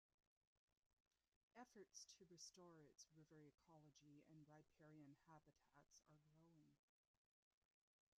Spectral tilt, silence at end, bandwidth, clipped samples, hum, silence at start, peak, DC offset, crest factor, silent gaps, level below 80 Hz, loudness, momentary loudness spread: -3.5 dB/octave; 1.4 s; 8.8 kHz; under 0.1%; none; 0.55 s; -48 dBFS; under 0.1%; 22 dB; 0.57-0.68 s, 0.77-1.11 s, 1.28-1.48 s; under -90 dBFS; -66 LUFS; 6 LU